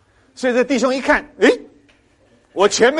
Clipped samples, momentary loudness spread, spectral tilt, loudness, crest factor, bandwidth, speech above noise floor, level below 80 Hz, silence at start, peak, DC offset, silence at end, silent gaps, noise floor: under 0.1%; 9 LU; -3 dB/octave; -17 LUFS; 16 dB; 11.5 kHz; 40 dB; -50 dBFS; 0.4 s; -2 dBFS; under 0.1%; 0 s; none; -55 dBFS